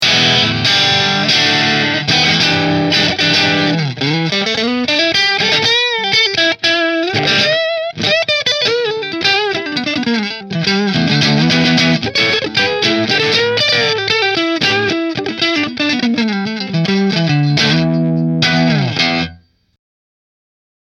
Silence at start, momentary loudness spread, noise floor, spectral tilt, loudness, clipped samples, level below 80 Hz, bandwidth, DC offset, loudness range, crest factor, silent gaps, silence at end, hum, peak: 0 s; 6 LU; -39 dBFS; -4 dB/octave; -12 LUFS; under 0.1%; -50 dBFS; 14.5 kHz; under 0.1%; 3 LU; 14 dB; none; 1.5 s; none; 0 dBFS